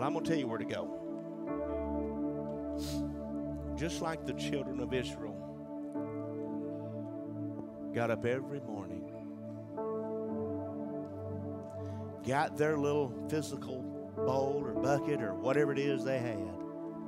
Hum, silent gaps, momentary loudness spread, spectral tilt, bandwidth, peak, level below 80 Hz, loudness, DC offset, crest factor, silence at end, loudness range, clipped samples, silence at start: none; none; 10 LU; -6.5 dB/octave; 15.5 kHz; -16 dBFS; -56 dBFS; -37 LUFS; under 0.1%; 20 dB; 0 s; 6 LU; under 0.1%; 0 s